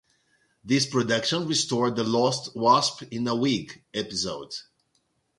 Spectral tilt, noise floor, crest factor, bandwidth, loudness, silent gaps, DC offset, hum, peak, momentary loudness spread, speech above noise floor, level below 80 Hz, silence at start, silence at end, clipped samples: -4 dB/octave; -72 dBFS; 20 dB; 11.5 kHz; -25 LUFS; none; under 0.1%; none; -6 dBFS; 11 LU; 47 dB; -64 dBFS; 0.65 s; 0.75 s; under 0.1%